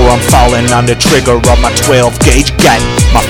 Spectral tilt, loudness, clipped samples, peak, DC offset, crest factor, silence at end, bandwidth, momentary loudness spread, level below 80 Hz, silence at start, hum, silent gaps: -4 dB/octave; -7 LUFS; 2%; 0 dBFS; under 0.1%; 6 dB; 0 s; 18.5 kHz; 2 LU; -14 dBFS; 0 s; none; none